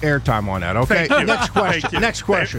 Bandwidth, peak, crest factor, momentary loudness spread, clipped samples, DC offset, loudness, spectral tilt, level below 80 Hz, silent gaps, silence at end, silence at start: 16.5 kHz; -4 dBFS; 14 dB; 5 LU; under 0.1%; under 0.1%; -18 LUFS; -5 dB/octave; -36 dBFS; none; 0 s; 0 s